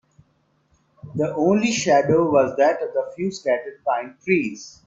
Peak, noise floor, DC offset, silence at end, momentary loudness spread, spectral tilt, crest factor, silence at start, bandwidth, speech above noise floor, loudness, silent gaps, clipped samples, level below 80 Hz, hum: -4 dBFS; -65 dBFS; under 0.1%; 0.15 s; 9 LU; -5 dB/octave; 18 dB; 1.05 s; 7.8 kHz; 44 dB; -21 LUFS; none; under 0.1%; -62 dBFS; none